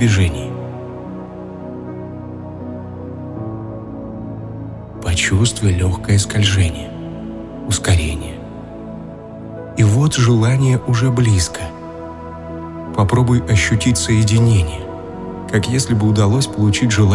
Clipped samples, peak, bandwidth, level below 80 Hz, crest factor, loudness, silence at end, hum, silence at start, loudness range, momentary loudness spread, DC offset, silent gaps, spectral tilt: under 0.1%; -2 dBFS; 12 kHz; -36 dBFS; 16 dB; -16 LUFS; 0 s; none; 0 s; 13 LU; 17 LU; under 0.1%; none; -5.5 dB/octave